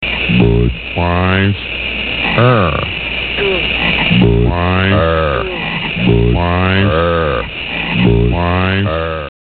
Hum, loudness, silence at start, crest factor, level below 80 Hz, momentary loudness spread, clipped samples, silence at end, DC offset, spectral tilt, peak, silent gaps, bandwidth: none; -13 LUFS; 0 s; 12 dB; -24 dBFS; 7 LU; under 0.1%; 0.2 s; 0.4%; -10.5 dB/octave; 0 dBFS; none; 4.6 kHz